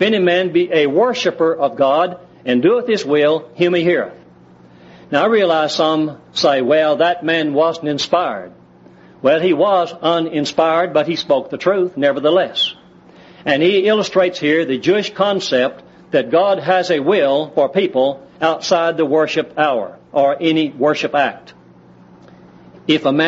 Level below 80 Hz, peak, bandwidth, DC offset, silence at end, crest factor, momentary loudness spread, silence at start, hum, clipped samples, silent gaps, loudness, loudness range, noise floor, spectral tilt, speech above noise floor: -62 dBFS; -2 dBFS; 8 kHz; under 0.1%; 0 s; 14 dB; 6 LU; 0 s; none; under 0.1%; none; -16 LUFS; 2 LU; -44 dBFS; -3 dB/octave; 29 dB